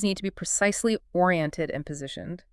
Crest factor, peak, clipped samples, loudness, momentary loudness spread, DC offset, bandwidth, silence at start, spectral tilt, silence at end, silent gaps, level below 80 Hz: 18 dB; -8 dBFS; under 0.1%; -26 LUFS; 12 LU; under 0.1%; 12 kHz; 0 s; -4 dB/octave; 0.15 s; none; -54 dBFS